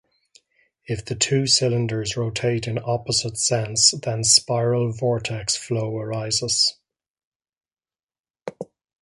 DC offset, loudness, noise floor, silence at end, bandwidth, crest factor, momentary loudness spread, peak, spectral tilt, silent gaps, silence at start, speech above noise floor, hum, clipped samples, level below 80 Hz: under 0.1%; -21 LUFS; under -90 dBFS; 0.4 s; 11.5 kHz; 24 dB; 15 LU; 0 dBFS; -3 dB/octave; 7.10-7.15 s, 7.25-7.40 s, 7.57-7.61 s, 8.03-8.07 s, 8.20-8.24 s; 0.9 s; over 68 dB; none; under 0.1%; -54 dBFS